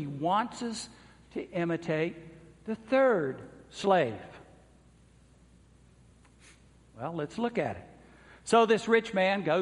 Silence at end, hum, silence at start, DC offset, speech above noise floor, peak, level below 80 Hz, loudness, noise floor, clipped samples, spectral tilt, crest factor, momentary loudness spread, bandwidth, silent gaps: 0 s; none; 0 s; under 0.1%; 31 dB; -10 dBFS; -64 dBFS; -29 LUFS; -59 dBFS; under 0.1%; -5.5 dB/octave; 22 dB; 20 LU; 11.5 kHz; none